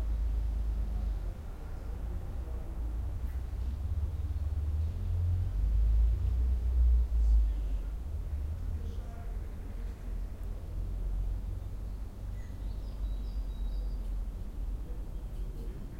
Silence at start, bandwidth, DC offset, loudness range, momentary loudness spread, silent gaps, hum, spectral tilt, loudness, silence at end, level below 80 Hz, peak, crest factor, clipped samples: 0 s; 5.2 kHz; under 0.1%; 9 LU; 13 LU; none; none; -8 dB/octave; -36 LUFS; 0 s; -32 dBFS; -18 dBFS; 14 dB; under 0.1%